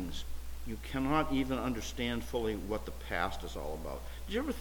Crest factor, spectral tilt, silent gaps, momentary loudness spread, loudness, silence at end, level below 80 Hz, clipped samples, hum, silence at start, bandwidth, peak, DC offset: 18 dB; -5 dB/octave; none; 12 LU; -36 LUFS; 0 s; -44 dBFS; under 0.1%; none; 0 s; 19 kHz; -16 dBFS; under 0.1%